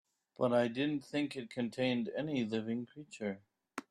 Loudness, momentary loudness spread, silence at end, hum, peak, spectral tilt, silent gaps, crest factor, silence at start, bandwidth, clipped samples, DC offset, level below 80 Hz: -36 LUFS; 14 LU; 0.1 s; none; -18 dBFS; -6 dB/octave; none; 18 dB; 0.4 s; 11.5 kHz; under 0.1%; under 0.1%; -76 dBFS